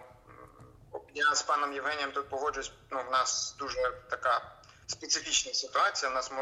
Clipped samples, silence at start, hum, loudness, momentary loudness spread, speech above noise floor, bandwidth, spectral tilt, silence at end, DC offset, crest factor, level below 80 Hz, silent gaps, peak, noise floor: under 0.1%; 0 s; none; -31 LUFS; 13 LU; 22 dB; 12.5 kHz; 0 dB/octave; 0 s; under 0.1%; 18 dB; -62 dBFS; none; -14 dBFS; -54 dBFS